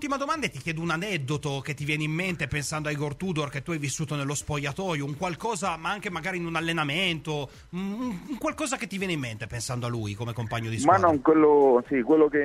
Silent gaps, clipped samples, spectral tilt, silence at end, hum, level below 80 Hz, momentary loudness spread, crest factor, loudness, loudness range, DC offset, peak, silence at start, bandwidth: none; under 0.1%; -5 dB/octave; 0 s; none; -54 dBFS; 11 LU; 20 dB; -27 LUFS; 6 LU; under 0.1%; -6 dBFS; 0 s; 15 kHz